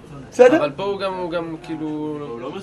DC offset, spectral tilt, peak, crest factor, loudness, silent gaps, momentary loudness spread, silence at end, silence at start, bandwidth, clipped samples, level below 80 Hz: under 0.1%; -6 dB/octave; 0 dBFS; 20 dB; -20 LUFS; none; 16 LU; 0 s; 0 s; 10.5 kHz; under 0.1%; -54 dBFS